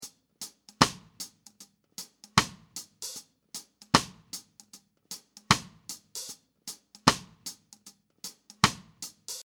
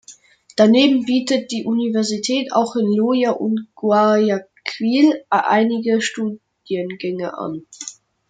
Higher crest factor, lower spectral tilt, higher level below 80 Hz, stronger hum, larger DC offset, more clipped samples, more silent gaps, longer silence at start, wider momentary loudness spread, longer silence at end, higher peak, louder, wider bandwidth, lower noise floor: first, 34 dB vs 16 dB; second, -3 dB/octave vs -4.5 dB/octave; first, -56 dBFS vs -68 dBFS; neither; neither; neither; neither; about the same, 0 s vs 0.1 s; first, 18 LU vs 14 LU; second, 0 s vs 0.35 s; about the same, 0 dBFS vs -2 dBFS; second, -28 LUFS vs -18 LUFS; first, over 20 kHz vs 9.4 kHz; first, -58 dBFS vs -46 dBFS